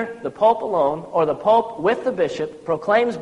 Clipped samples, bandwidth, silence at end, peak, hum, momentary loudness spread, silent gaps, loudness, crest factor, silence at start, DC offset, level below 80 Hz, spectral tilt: under 0.1%; 10.5 kHz; 0 s; -4 dBFS; none; 7 LU; none; -20 LUFS; 16 dB; 0 s; under 0.1%; -58 dBFS; -6 dB/octave